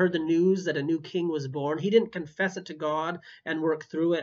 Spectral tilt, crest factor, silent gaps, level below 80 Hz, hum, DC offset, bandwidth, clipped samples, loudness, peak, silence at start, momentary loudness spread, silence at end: -6.5 dB/octave; 18 dB; none; -74 dBFS; none; under 0.1%; 7.4 kHz; under 0.1%; -28 LUFS; -10 dBFS; 0 s; 9 LU; 0 s